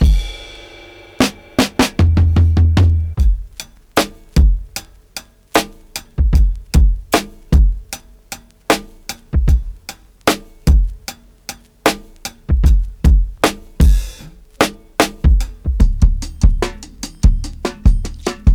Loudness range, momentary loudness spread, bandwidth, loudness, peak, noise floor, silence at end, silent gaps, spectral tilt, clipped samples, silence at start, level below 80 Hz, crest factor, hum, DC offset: 4 LU; 18 LU; 18 kHz; -17 LUFS; 0 dBFS; -39 dBFS; 0 s; none; -5.5 dB/octave; under 0.1%; 0 s; -16 dBFS; 14 dB; none; under 0.1%